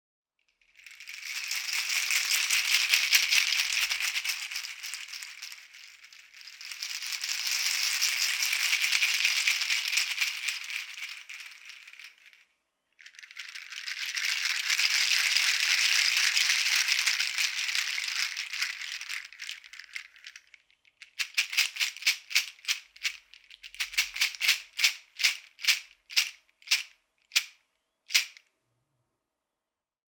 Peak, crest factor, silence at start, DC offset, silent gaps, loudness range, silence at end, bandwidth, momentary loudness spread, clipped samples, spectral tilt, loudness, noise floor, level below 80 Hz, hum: -4 dBFS; 28 dB; 0.85 s; under 0.1%; none; 11 LU; 1.8 s; over 20 kHz; 19 LU; under 0.1%; 7.5 dB/octave; -26 LUFS; -89 dBFS; -80 dBFS; none